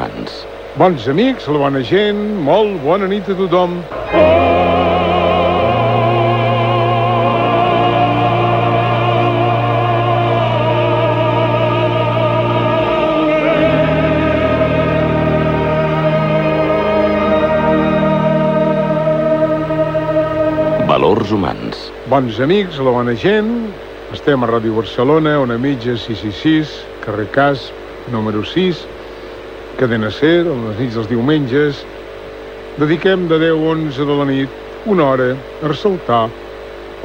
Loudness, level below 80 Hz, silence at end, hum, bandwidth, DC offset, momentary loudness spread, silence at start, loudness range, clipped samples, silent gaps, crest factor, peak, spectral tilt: -14 LUFS; -38 dBFS; 0 s; none; 8.6 kHz; under 0.1%; 11 LU; 0 s; 4 LU; under 0.1%; none; 14 dB; 0 dBFS; -8 dB/octave